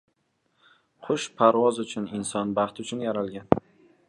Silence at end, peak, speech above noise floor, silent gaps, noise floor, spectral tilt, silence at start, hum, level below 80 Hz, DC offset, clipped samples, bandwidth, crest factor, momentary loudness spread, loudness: 0.5 s; 0 dBFS; 47 dB; none; -72 dBFS; -5 dB/octave; 1 s; none; -58 dBFS; under 0.1%; under 0.1%; 11.5 kHz; 26 dB; 11 LU; -26 LUFS